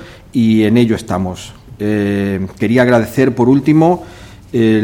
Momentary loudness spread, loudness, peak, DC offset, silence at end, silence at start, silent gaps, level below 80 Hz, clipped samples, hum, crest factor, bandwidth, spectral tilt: 11 LU; -14 LUFS; 0 dBFS; under 0.1%; 0 s; 0 s; none; -44 dBFS; under 0.1%; none; 14 dB; 17.5 kHz; -7.5 dB/octave